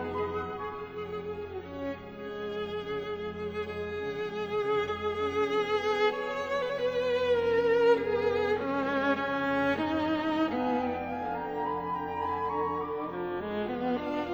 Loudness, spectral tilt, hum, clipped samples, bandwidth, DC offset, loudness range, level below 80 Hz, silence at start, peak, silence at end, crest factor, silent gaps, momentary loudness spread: -31 LUFS; -6 dB/octave; none; under 0.1%; over 20 kHz; under 0.1%; 9 LU; -58 dBFS; 0 s; -12 dBFS; 0 s; 18 dB; none; 11 LU